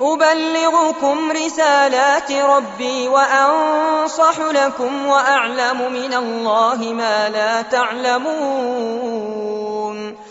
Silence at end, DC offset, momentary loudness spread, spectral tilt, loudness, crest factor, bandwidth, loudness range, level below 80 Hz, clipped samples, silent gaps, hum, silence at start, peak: 0 s; under 0.1%; 9 LU; -0.5 dB/octave; -16 LUFS; 16 dB; 8 kHz; 4 LU; -64 dBFS; under 0.1%; none; none; 0 s; -2 dBFS